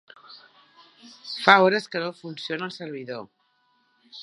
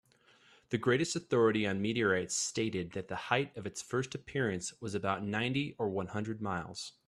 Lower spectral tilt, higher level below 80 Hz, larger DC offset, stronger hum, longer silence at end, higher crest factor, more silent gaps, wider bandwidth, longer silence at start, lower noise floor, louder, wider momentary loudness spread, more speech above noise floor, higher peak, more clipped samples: about the same, -4.5 dB/octave vs -4.5 dB/octave; second, -78 dBFS vs -68 dBFS; neither; neither; second, 0 s vs 0.15 s; about the same, 26 dB vs 22 dB; neither; second, 11.5 kHz vs 14 kHz; second, 0.3 s vs 0.7 s; about the same, -67 dBFS vs -65 dBFS; first, -23 LUFS vs -34 LUFS; first, 20 LU vs 9 LU; first, 44 dB vs 31 dB; first, 0 dBFS vs -12 dBFS; neither